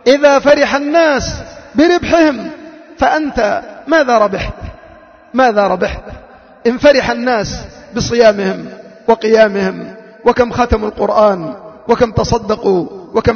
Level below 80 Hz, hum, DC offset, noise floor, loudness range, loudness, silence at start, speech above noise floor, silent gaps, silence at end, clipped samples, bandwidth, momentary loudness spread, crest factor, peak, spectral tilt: -34 dBFS; none; under 0.1%; -40 dBFS; 2 LU; -13 LUFS; 0.05 s; 28 dB; none; 0 s; under 0.1%; 6.8 kHz; 16 LU; 12 dB; 0 dBFS; -5 dB/octave